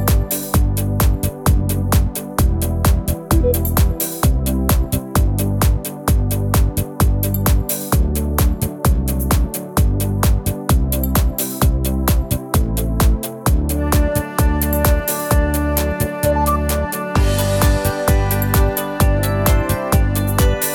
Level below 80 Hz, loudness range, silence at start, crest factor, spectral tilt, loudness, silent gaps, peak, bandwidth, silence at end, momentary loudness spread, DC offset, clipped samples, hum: -20 dBFS; 1 LU; 0 s; 16 dB; -5.5 dB/octave; -18 LUFS; none; 0 dBFS; 19.5 kHz; 0 s; 3 LU; under 0.1%; under 0.1%; none